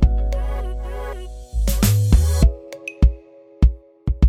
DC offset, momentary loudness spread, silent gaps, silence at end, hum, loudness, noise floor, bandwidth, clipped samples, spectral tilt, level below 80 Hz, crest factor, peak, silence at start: under 0.1%; 16 LU; none; 0 s; none; -21 LUFS; -41 dBFS; 16 kHz; under 0.1%; -6 dB/octave; -20 dBFS; 16 dB; -2 dBFS; 0 s